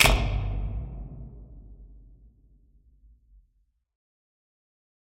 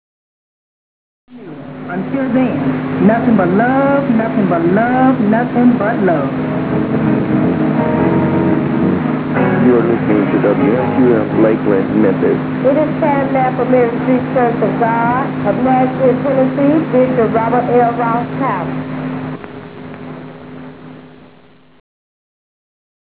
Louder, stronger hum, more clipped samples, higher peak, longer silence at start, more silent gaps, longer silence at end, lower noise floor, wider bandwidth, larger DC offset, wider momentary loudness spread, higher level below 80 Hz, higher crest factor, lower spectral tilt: second, -29 LUFS vs -14 LUFS; neither; neither; second, -4 dBFS vs 0 dBFS; second, 0 s vs 1.3 s; neither; first, 3.1 s vs 1.95 s; first, -70 dBFS vs -45 dBFS; first, 12 kHz vs 4 kHz; neither; first, 25 LU vs 12 LU; first, -34 dBFS vs -44 dBFS; first, 28 dB vs 14 dB; second, -3.5 dB/octave vs -12 dB/octave